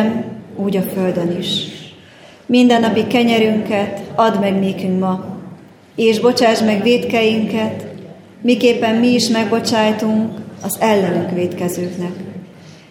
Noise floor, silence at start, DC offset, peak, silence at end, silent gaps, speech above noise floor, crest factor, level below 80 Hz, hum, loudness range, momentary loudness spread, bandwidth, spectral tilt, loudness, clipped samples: -42 dBFS; 0 s; under 0.1%; 0 dBFS; 0.15 s; none; 27 dB; 16 dB; -60 dBFS; none; 2 LU; 15 LU; 16.5 kHz; -5 dB/octave; -16 LUFS; under 0.1%